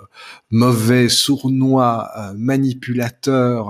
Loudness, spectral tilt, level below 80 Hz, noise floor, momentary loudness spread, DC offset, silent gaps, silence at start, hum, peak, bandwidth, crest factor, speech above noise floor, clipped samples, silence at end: -16 LUFS; -5 dB/octave; -58 dBFS; -41 dBFS; 9 LU; under 0.1%; none; 0.2 s; none; -2 dBFS; 15.5 kHz; 14 dB; 25 dB; under 0.1%; 0 s